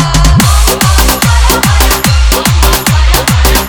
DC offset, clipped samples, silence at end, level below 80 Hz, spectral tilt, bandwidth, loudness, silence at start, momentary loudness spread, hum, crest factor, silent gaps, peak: under 0.1%; 1%; 0 s; -10 dBFS; -4 dB/octave; over 20 kHz; -7 LUFS; 0 s; 2 LU; none; 6 dB; none; 0 dBFS